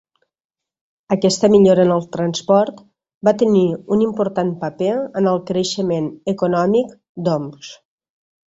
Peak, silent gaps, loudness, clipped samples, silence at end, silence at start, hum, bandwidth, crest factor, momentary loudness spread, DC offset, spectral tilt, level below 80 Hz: -2 dBFS; 3.14-3.21 s, 7.09-7.15 s; -17 LUFS; under 0.1%; 0.75 s; 1.1 s; none; 8 kHz; 16 dB; 11 LU; under 0.1%; -6 dB/octave; -58 dBFS